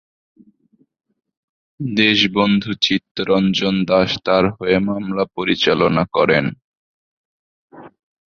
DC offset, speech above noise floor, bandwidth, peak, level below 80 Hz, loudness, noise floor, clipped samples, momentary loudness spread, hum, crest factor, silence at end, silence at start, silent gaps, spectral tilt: under 0.1%; 43 dB; 7 kHz; 0 dBFS; -50 dBFS; -17 LUFS; -60 dBFS; under 0.1%; 7 LU; none; 18 dB; 0.4 s; 1.8 s; 3.11-3.15 s, 6.64-7.68 s; -5.5 dB/octave